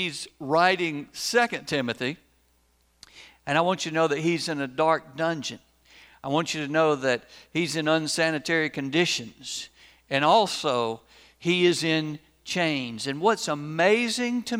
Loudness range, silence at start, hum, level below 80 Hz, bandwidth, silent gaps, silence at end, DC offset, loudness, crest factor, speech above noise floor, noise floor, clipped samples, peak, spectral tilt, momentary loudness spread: 3 LU; 0 s; none; -66 dBFS; over 20 kHz; none; 0 s; under 0.1%; -25 LUFS; 20 dB; 40 dB; -65 dBFS; under 0.1%; -6 dBFS; -4 dB/octave; 13 LU